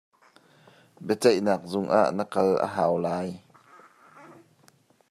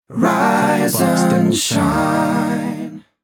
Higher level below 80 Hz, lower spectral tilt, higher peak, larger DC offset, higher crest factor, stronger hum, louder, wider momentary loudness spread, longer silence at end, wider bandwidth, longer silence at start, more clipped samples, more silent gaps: second, -74 dBFS vs -48 dBFS; about the same, -6 dB/octave vs -5 dB/octave; second, -6 dBFS vs -2 dBFS; neither; first, 20 dB vs 14 dB; neither; second, -25 LUFS vs -16 LUFS; first, 12 LU vs 8 LU; first, 0.85 s vs 0.25 s; second, 15 kHz vs 19 kHz; first, 1 s vs 0.1 s; neither; neither